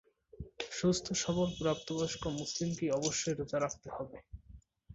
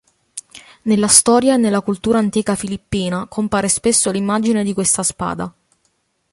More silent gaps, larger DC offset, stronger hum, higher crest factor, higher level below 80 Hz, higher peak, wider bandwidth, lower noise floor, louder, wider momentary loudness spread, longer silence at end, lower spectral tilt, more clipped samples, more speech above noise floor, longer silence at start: neither; neither; neither; about the same, 18 dB vs 18 dB; second, -58 dBFS vs -48 dBFS; second, -18 dBFS vs 0 dBFS; second, 8 kHz vs 15 kHz; second, -58 dBFS vs -65 dBFS; second, -35 LUFS vs -16 LUFS; about the same, 18 LU vs 17 LU; second, 0 s vs 0.85 s; first, -5 dB/octave vs -3.5 dB/octave; neither; second, 23 dB vs 49 dB; about the same, 0.35 s vs 0.35 s